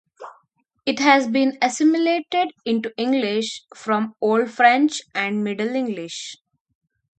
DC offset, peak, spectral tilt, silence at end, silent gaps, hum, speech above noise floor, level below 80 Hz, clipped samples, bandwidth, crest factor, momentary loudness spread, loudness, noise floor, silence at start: under 0.1%; 0 dBFS; -4 dB/octave; 0.85 s; none; none; 44 dB; -72 dBFS; under 0.1%; 9 kHz; 20 dB; 13 LU; -20 LUFS; -64 dBFS; 0.2 s